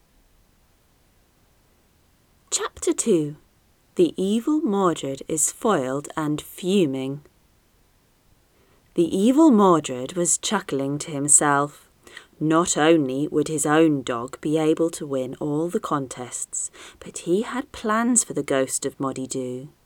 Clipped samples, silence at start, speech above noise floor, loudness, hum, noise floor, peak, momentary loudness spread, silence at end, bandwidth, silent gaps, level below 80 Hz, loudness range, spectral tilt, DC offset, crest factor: under 0.1%; 2.5 s; 39 dB; -22 LUFS; none; -61 dBFS; -2 dBFS; 13 LU; 0.2 s; 18 kHz; none; -60 dBFS; 8 LU; -4 dB/octave; under 0.1%; 22 dB